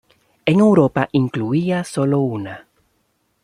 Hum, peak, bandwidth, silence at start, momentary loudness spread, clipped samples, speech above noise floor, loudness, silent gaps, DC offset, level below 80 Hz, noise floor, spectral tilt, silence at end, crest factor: none; -2 dBFS; 11.5 kHz; 0.45 s; 14 LU; under 0.1%; 49 dB; -18 LUFS; none; under 0.1%; -58 dBFS; -66 dBFS; -7.5 dB/octave; 0.85 s; 16 dB